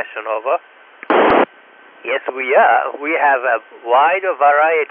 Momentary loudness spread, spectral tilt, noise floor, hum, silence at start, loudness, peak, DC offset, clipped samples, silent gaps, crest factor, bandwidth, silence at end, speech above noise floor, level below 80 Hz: 10 LU; -7.5 dB/octave; -45 dBFS; none; 0 s; -15 LUFS; 0 dBFS; under 0.1%; under 0.1%; none; 16 dB; 5.2 kHz; 0.05 s; 29 dB; -56 dBFS